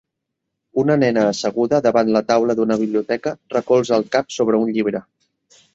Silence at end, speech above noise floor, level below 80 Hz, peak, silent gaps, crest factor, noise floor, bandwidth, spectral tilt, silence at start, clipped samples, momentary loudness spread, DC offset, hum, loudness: 0.75 s; 61 dB; -60 dBFS; -2 dBFS; none; 16 dB; -79 dBFS; 8 kHz; -6 dB/octave; 0.75 s; under 0.1%; 7 LU; under 0.1%; none; -18 LUFS